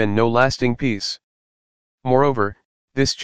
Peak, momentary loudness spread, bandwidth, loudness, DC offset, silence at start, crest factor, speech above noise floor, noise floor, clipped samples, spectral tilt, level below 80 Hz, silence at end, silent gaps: 0 dBFS; 13 LU; 9.8 kHz; -20 LUFS; under 0.1%; 0 s; 20 dB; over 71 dB; under -90 dBFS; under 0.1%; -5 dB/octave; -46 dBFS; 0 s; 1.23-1.98 s, 2.65-2.88 s